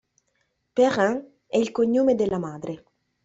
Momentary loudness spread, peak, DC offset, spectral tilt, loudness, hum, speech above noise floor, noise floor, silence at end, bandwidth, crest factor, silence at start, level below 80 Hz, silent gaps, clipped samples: 14 LU; -8 dBFS; under 0.1%; -6 dB/octave; -23 LUFS; none; 50 dB; -72 dBFS; 0.5 s; 8 kHz; 16 dB; 0.75 s; -62 dBFS; none; under 0.1%